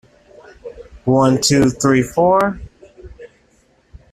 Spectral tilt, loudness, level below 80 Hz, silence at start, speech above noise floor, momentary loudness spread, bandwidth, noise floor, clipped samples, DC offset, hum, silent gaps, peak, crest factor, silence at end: -5 dB/octave; -15 LUFS; -44 dBFS; 0.65 s; 42 dB; 23 LU; 14.5 kHz; -56 dBFS; under 0.1%; under 0.1%; none; none; -2 dBFS; 16 dB; 0.85 s